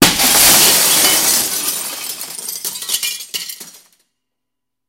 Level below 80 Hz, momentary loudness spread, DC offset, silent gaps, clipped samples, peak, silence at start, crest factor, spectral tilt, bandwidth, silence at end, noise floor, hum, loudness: -46 dBFS; 17 LU; under 0.1%; none; under 0.1%; 0 dBFS; 0 s; 16 dB; 0 dB/octave; over 20 kHz; 1.2 s; -81 dBFS; none; -11 LUFS